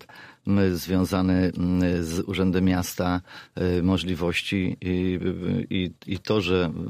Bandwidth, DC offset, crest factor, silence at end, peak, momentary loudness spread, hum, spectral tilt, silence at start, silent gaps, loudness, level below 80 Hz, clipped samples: 15.5 kHz; under 0.1%; 16 dB; 0 s; -8 dBFS; 6 LU; none; -6.5 dB/octave; 0.15 s; none; -25 LUFS; -48 dBFS; under 0.1%